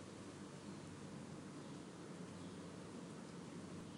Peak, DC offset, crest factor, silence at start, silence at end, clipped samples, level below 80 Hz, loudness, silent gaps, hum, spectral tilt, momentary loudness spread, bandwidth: -40 dBFS; under 0.1%; 12 dB; 0 s; 0 s; under 0.1%; -78 dBFS; -53 LUFS; none; none; -5.5 dB/octave; 1 LU; 11.5 kHz